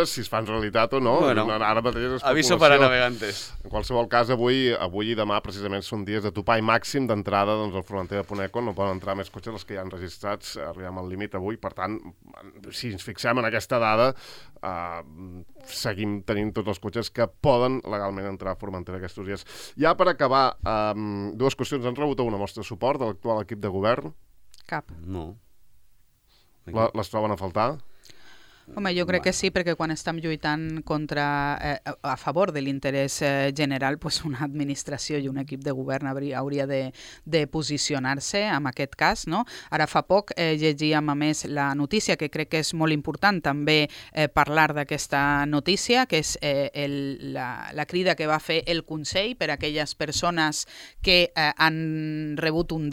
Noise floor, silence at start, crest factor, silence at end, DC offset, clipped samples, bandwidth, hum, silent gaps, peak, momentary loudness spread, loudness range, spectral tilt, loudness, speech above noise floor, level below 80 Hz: -62 dBFS; 0 s; 24 dB; 0 s; under 0.1%; under 0.1%; 16.5 kHz; none; none; 0 dBFS; 13 LU; 9 LU; -4.5 dB/octave; -25 LUFS; 36 dB; -48 dBFS